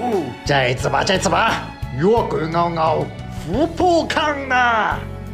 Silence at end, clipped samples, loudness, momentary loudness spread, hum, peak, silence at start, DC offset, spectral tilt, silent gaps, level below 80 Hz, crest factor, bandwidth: 0 s; under 0.1%; -18 LUFS; 9 LU; none; -4 dBFS; 0 s; under 0.1%; -5 dB/octave; none; -36 dBFS; 14 dB; 16 kHz